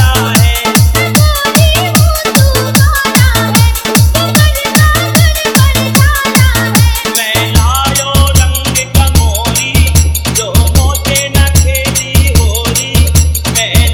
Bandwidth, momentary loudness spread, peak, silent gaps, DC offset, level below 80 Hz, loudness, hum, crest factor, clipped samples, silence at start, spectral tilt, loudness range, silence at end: over 20 kHz; 2 LU; 0 dBFS; none; under 0.1%; -14 dBFS; -9 LUFS; none; 8 dB; 1%; 0 s; -4 dB/octave; 1 LU; 0 s